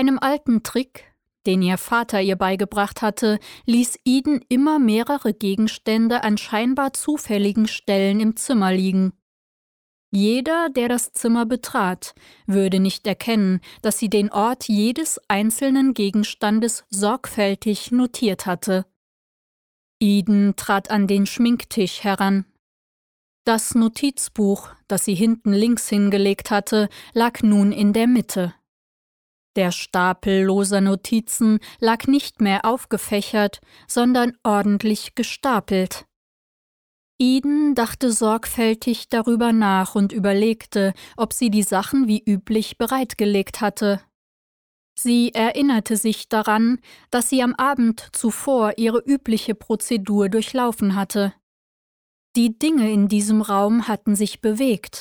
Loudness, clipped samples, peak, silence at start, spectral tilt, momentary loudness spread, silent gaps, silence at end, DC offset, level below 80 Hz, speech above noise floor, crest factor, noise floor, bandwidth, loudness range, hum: -20 LUFS; under 0.1%; -4 dBFS; 0 s; -5 dB/octave; 6 LU; 9.22-10.12 s, 18.96-20.00 s, 22.59-23.45 s, 28.68-29.54 s, 36.16-37.19 s, 44.15-44.96 s, 51.43-52.34 s; 0 s; under 0.1%; -56 dBFS; over 71 dB; 16 dB; under -90 dBFS; 19.5 kHz; 3 LU; none